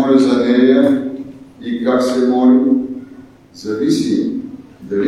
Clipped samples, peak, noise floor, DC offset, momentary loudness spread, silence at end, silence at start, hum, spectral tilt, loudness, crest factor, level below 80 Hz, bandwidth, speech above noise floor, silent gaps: under 0.1%; -2 dBFS; -39 dBFS; under 0.1%; 19 LU; 0 s; 0 s; none; -6 dB/octave; -14 LUFS; 14 dB; -56 dBFS; 11.5 kHz; 27 dB; none